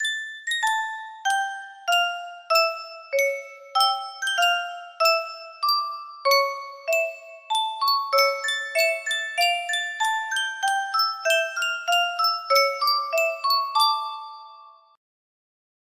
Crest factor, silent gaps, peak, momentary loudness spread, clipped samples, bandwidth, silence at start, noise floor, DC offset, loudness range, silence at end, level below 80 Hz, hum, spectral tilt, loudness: 18 dB; none; -6 dBFS; 10 LU; under 0.1%; 16 kHz; 0 s; -49 dBFS; under 0.1%; 2 LU; 1.25 s; -78 dBFS; none; 3.5 dB/octave; -23 LUFS